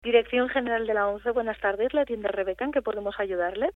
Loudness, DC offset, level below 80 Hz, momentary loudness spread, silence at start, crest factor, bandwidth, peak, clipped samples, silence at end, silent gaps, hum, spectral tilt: -27 LUFS; under 0.1%; -54 dBFS; 5 LU; 0.05 s; 18 dB; 4 kHz; -8 dBFS; under 0.1%; 0.05 s; none; none; -6.5 dB/octave